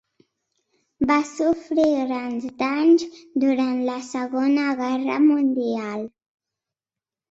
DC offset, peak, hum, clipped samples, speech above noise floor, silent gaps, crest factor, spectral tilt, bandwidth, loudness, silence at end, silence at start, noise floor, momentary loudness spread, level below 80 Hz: under 0.1%; -6 dBFS; none; under 0.1%; over 69 dB; none; 18 dB; -5 dB/octave; 8 kHz; -22 LUFS; 1.2 s; 1 s; under -90 dBFS; 10 LU; -62 dBFS